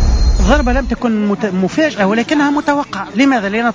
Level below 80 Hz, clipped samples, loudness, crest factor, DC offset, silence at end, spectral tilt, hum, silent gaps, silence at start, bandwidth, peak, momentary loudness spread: -18 dBFS; under 0.1%; -14 LUFS; 12 dB; under 0.1%; 0 s; -6 dB/octave; none; none; 0 s; 7.8 kHz; -2 dBFS; 4 LU